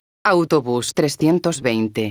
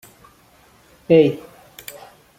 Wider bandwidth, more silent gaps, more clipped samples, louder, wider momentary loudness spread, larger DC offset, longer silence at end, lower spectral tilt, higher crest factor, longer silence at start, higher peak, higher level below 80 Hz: first, over 20 kHz vs 16.5 kHz; neither; neither; second, -19 LUFS vs -16 LUFS; second, 4 LU vs 23 LU; neither; second, 0 s vs 1 s; second, -5 dB/octave vs -7 dB/octave; about the same, 16 dB vs 20 dB; second, 0.25 s vs 1.1 s; about the same, -2 dBFS vs -2 dBFS; about the same, -58 dBFS vs -60 dBFS